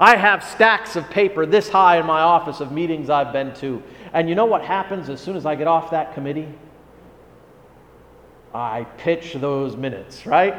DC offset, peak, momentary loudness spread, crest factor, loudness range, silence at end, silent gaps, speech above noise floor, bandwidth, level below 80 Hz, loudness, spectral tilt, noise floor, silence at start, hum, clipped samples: under 0.1%; 0 dBFS; 14 LU; 20 dB; 11 LU; 0 s; none; 29 dB; 16 kHz; -56 dBFS; -19 LUFS; -5.5 dB/octave; -48 dBFS; 0 s; none; under 0.1%